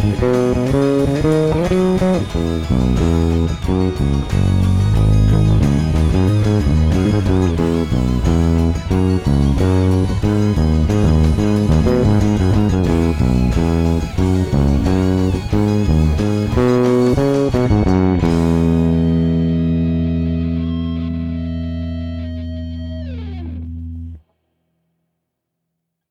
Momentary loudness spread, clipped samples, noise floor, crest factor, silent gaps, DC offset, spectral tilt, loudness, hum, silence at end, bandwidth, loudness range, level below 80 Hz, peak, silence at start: 9 LU; under 0.1%; -76 dBFS; 10 dB; none; 0.7%; -8 dB/octave; -16 LUFS; none; 1.9 s; 13.5 kHz; 10 LU; -24 dBFS; -4 dBFS; 0 s